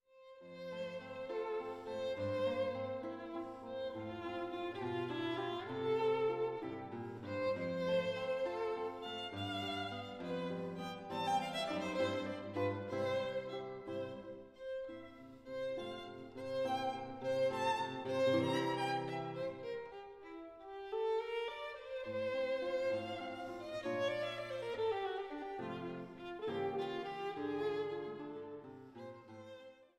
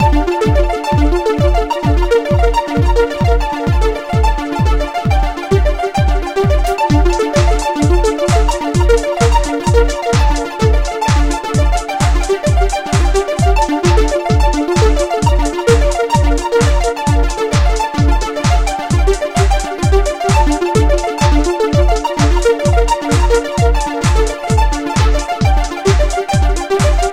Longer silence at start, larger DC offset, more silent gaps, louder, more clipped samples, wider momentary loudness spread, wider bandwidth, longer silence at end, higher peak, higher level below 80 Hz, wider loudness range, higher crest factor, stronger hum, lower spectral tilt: first, 0.15 s vs 0 s; neither; neither; second, -40 LUFS vs -14 LUFS; neither; first, 14 LU vs 3 LU; about the same, 13 kHz vs 13.5 kHz; first, 0.15 s vs 0 s; second, -22 dBFS vs 0 dBFS; second, -74 dBFS vs -16 dBFS; first, 5 LU vs 1 LU; first, 18 dB vs 12 dB; neither; about the same, -5.5 dB/octave vs -5.5 dB/octave